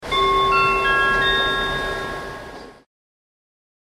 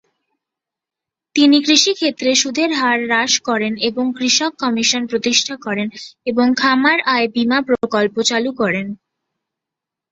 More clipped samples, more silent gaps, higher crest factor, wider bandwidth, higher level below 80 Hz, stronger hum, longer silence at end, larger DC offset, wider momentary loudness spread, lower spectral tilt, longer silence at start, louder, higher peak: neither; neither; about the same, 14 dB vs 18 dB; first, 15 kHz vs 8 kHz; first, -40 dBFS vs -62 dBFS; neither; about the same, 1.25 s vs 1.15 s; neither; first, 16 LU vs 10 LU; first, -3.5 dB/octave vs -2 dB/octave; second, 0 s vs 1.35 s; about the same, -18 LUFS vs -16 LUFS; second, -6 dBFS vs 0 dBFS